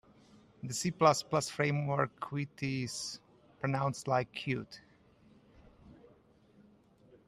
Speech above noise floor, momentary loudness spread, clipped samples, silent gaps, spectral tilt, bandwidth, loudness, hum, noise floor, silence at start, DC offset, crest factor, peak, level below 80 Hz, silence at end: 31 dB; 13 LU; under 0.1%; none; -5 dB/octave; 13.5 kHz; -34 LUFS; none; -64 dBFS; 0.65 s; under 0.1%; 24 dB; -12 dBFS; -68 dBFS; 1.35 s